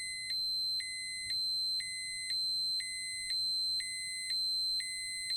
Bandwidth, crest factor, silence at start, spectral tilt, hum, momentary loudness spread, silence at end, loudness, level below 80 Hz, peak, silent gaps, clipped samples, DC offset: 19.5 kHz; 10 dB; 0 s; 3 dB/octave; none; 6 LU; 0 s; -33 LUFS; -68 dBFS; -26 dBFS; none; under 0.1%; under 0.1%